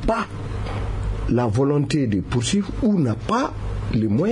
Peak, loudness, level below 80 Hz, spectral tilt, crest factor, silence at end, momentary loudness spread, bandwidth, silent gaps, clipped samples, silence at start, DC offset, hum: -8 dBFS; -22 LUFS; -32 dBFS; -6.5 dB/octave; 14 dB; 0 s; 8 LU; 11 kHz; none; under 0.1%; 0 s; under 0.1%; none